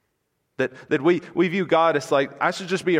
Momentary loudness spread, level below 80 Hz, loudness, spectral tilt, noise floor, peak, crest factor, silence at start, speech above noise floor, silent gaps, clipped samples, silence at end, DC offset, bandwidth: 8 LU; -70 dBFS; -22 LUFS; -5.5 dB/octave; -74 dBFS; -6 dBFS; 16 dB; 0.6 s; 52 dB; none; under 0.1%; 0 s; under 0.1%; 11.5 kHz